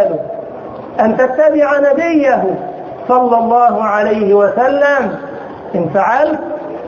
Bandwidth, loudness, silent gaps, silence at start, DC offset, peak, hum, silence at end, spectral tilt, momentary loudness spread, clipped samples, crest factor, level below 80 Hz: 7 kHz; -12 LUFS; none; 0 s; under 0.1%; 0 dBFS; none; 0 s; -7 dB/octave; 14 LU; under 0.1%; 12 dB; -52 dBFS